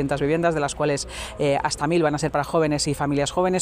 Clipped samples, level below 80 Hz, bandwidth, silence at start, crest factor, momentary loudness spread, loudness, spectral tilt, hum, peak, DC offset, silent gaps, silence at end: under 0.1%; -44 dBFS; 15.5 kHz; 0 s; 14 dB; 3 LU; -23 LUFS; -5 dB/octave; none; -8 dBFS; under 0.1%; none; 0 s